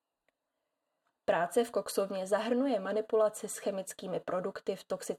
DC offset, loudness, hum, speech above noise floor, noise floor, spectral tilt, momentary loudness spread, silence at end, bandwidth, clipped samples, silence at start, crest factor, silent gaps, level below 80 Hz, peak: under 0.1%; -33 LUFS; none; 53 dB; -86 dBFS; -4 dB/octave; 9 LU; 0 s; 16 kHz; under 0.1%; 1.3 s; 16 dB; none; -78 dBFS; -18 dBFS